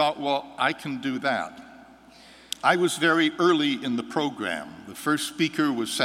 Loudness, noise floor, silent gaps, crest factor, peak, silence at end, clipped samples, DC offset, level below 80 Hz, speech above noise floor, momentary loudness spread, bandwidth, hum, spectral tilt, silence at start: -25 LUFS; -50 dBFS; none; 20 dB; -4 dBFS; 0 s; under 0.1%; under 0.1%; -68 dBFS; 25 dB; 10 LU; 16 kHz; none; -4 dB/octave; 0 s